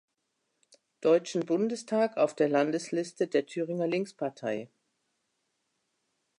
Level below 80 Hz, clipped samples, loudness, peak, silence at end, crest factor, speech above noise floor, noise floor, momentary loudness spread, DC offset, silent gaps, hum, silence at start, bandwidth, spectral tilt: -84 dBFS; under 0.1%; -30 LUFS; -12 dBFS; 1.75 s; 18 dB; 51 dB; -80 dBFS; 9 LU; under 0.1%; none; none; 1 s; 11 kHz; -5.5 dB/octave